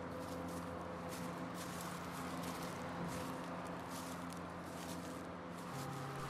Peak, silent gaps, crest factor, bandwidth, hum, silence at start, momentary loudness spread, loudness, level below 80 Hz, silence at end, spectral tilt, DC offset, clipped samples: -30 dBFS; none; 14 dB; 16 kHz; none; 0 s; 3 LU; -46 LUFS; -68 dBFS; 0 s; -5 dB/octave; under 0.1%; under 0.1%